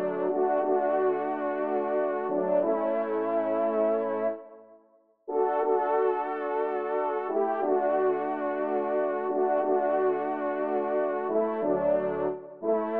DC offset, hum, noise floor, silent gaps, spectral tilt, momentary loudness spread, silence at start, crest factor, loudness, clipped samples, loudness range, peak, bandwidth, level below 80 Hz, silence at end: under 0.1%; none; -63 dBFS; none; -5.5 dB/octave; 4 LU; 0 s; 14 dB; -28 LUFS; under 0.1%; 2 LU; -14 dBFS; 3.9 kHz; -72 dBFS; 0 s